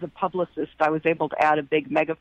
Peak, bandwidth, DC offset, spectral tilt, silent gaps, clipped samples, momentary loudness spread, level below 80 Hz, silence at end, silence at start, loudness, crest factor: -8 dBFS; 8.4 kHz; under 0.1%; -7 dB/octave; none; under 0.1%; 7 LU; -64 dBFS; 0.05 s; 0 s; -24 LUFS; 16 dB